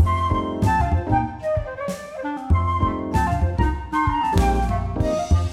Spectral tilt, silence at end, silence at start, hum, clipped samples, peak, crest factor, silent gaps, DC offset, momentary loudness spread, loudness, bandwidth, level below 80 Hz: -7 dB/octave; 0 s; 0 s; none; under 0.1%; -4 dBFS; 16 dB; none; under 0.1%; 9 LU; -22 LUFS; 13 kHz; -28 dBFS